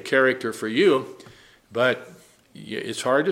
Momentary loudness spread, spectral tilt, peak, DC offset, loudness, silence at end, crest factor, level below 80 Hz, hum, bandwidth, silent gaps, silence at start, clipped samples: 14 LU; -4.5 dB/octave; -6 dBFS; under 0.1%; -23 LUFS; 0 s; 18 dB; -70 dBFS; none; 16 kHz; none; 0.05 s; under 0.1%